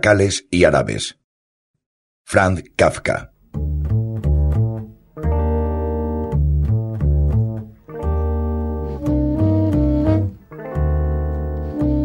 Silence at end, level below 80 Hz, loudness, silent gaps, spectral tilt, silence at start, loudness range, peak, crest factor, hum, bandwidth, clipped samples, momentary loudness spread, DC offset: 0 s; -24 dBFS; -20 LUFS; 1.24-1.74 s, 1.86-2.25 s; -6.5 dB/octave; 0 s; 2 LU; 0 dBFS; 18 dB; none; 11 kHz; under 0.1%; 10 LU; under 0.1%